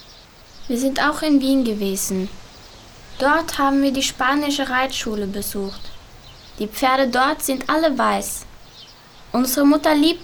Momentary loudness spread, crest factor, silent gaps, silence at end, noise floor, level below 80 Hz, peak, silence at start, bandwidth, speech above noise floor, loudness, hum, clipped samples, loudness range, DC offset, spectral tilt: 12 LU; 16 dB; none; 0 s; -45 dBFS; -44 dBFS; -4 dBFS; 0 s; over 20 kHz; 26 dB; -19 LUFS; none; under 0.1%; 2 LU; under 0.1%; -3.5 dB/octave